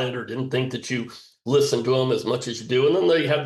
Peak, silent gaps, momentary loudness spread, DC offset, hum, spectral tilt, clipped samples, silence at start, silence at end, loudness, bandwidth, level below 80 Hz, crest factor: -8 dBFS; none; 10 LU; under 0.1%; none; -5 dB/octave; under 0.1%; 0 s; 0 s; -23 LUFS; 12.5 kHz; -66 dBFS; 14 dB